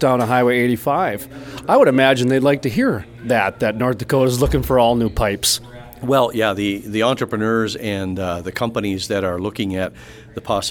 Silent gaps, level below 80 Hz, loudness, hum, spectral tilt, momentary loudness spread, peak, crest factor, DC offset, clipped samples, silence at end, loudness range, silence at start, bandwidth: none; -36 dBFS; -18 LUFS; none; -5 dB/octave; 10 LU; 0 dBFS; 18 dB; under 0.1%; under 0.1%; 0 s; 5 LU; 0 s; 19 kHz